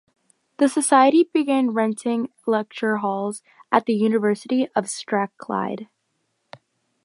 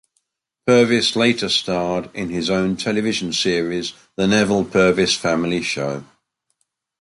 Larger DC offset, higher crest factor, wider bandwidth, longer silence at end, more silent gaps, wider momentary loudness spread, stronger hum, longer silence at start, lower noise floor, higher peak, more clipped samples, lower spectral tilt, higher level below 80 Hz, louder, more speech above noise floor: neither; about the same, 20 dB vs 16 dB; about the same, 11.5 kHz vs 11.5 kHz; first, 1.2 s vs 0.95 s; neither; about the same, 11 LU vs 10 LU; neither; about the same, 0.6 s vs 0.65 s; about the same, -73 dBFS vs -74 dBFS; about the same, -2 dBFS vs -2 dBFS; neither; about the same, -4.5 dB/octave vs -4 dB/octave; second, -76 dBFS vs -50 dBFS; about the same, -21 LUFS vs -19 LUFS; about the same, 52 dB vs 55 dB